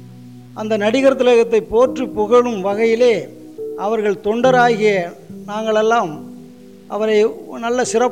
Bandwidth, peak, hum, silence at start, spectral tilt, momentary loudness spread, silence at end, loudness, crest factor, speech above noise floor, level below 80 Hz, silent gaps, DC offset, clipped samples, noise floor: 10.5 kHz; -4 dBFS; none; 0 s; -4.5 dB/octave; 16 LU; 0 s; -16 LUFS; 14 dB; 24 dB; -52 dBFS; none; 0.3%; under 0.1%; -39 dBFS